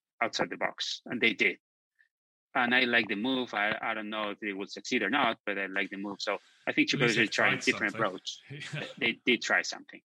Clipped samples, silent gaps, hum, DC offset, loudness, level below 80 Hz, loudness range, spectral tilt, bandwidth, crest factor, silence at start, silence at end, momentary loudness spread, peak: under 0.1%; 1.60-1.91 s, 2.11-2.51 s, 5.40-5.44 s; none; under 0.1%; -29 LUFS; -76 dBFS; 3 LU; -3.5 dB/octave; 16 kHz; 22 dB; 0.2 s; 0.1 s; 11 LU; -8 dBFS